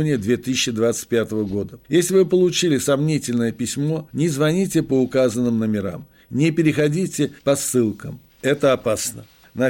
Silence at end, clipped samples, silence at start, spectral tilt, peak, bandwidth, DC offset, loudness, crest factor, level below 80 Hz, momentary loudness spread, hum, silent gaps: 0 s; under 0.1%; 0 s; -5 dB/octave; -6 dBFS; 16.5 kHz; under 0.1%; -20 LUFS; 14 dB; -54 dBFS; 9 LU; none; none